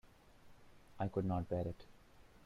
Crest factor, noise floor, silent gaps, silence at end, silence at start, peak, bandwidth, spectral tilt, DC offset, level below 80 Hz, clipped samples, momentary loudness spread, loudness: 18 dB; -62 dBFS; none; 0.25 s; 0.05 s; -24 dBFS; 11 kHz; -9 dB/octave; under 0.1%; -62 dBFS; under 0.1%; 8 LU; -41 LUFS